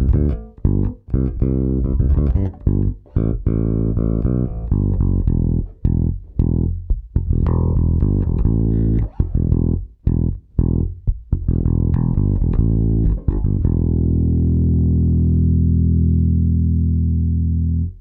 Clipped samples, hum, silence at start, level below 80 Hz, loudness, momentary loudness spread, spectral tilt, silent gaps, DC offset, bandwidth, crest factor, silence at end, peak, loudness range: under 0.1%; none; 0 s; -20 dBFS; -19 LUFS; 6 LU; -14.5 dB/octave; none; under 0.1%; 2 kHz; 14 dB; 0 s; -2 dBFS; 3 LU